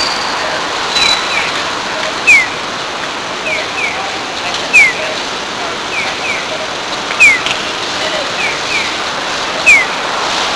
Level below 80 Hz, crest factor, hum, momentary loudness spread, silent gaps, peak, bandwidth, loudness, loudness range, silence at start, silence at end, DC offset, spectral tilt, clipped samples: -46 dBFS; 14 dB; none; 11 LU; none; 0 dBFS; 11 kHz; -12 LUFS; 2 LU; 0 s; 0 s; under 0.1%; -1 dB/octave; 0.3%